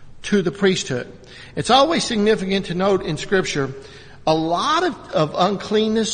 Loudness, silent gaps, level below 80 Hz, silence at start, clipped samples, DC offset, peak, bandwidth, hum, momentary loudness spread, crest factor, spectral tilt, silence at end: -20 LUFS; none; -46 dBFS; 0 s; under 0.1%; under 0.1%; 0 dBFS; 9.4 kHz; none; 11 LU; 20 dB; -4.5 dB/octave; 0 s